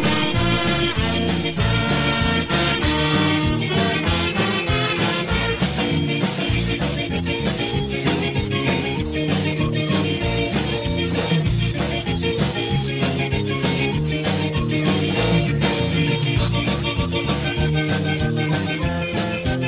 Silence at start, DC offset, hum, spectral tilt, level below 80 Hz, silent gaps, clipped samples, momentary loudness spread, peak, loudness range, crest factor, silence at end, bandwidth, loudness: 0 s; under 0.1%; none; -10.5 dB/octave; -32 dBFS; none; under 0.1%; 4 LU; -6 dBFS; 2 LU; 14 dB; 0 s; 4 kHz; -21 LUFS